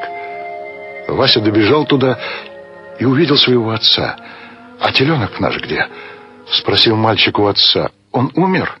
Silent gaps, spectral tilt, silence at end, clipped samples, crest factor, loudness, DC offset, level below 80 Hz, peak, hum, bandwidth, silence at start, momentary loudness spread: none; -7 dB/octave; 0.05 s; under 0.1%; 16 dB; -13 LUFS; under 0.1%; -50 dBFS; 0 dBFS; none; 11 kHz; 0 s; 17 LU